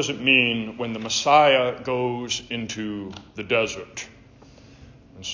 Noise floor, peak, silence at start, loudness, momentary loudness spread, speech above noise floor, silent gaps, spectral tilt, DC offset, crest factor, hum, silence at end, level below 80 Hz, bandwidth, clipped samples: -49 dBFS; -4 dBFS; 0 s; -21 LUFS; 19 LU; 26 dB; none; -3 dB/octave; under 0.1%; 20 dB; none; 0 s; -56 dBFS; 7.8 kHz; under 0.1%